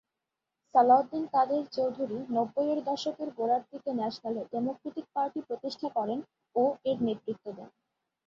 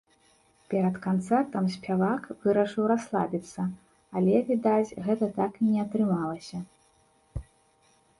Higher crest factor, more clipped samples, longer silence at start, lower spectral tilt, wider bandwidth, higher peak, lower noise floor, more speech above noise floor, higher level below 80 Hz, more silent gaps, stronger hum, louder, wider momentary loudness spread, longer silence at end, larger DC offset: about the same, 20 dB vs 18 dB; neither; about the same, 0.75 s vs 0.7 s; second, -6.5 dB/octave vs -8 dB/octave; second, 7.4 kHz vs 11.5 kHz; about the same, -10 dBFS vs -10 dBFS; first, -87 dBFS vs -64 dBFS; first, 57 dB vs 38 dB; second, -76 dBFS vs -56 dBFS; neither; neither; second, -30 LUFS vs -27 LUFS; second, 11 LU vs 15 LU; second, 0.6 s vs 0.8 s; neither